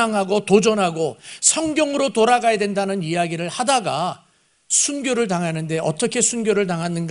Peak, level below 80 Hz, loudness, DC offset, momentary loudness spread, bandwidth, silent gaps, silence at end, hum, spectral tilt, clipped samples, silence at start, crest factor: 0 dBFS; -60 dBFS; -19 LUFS; under 0.1%; 7 LU; 11 kHz; none; 0 s; none; -3.5 dB/octave; under 0.1%; 0 s; 20 dB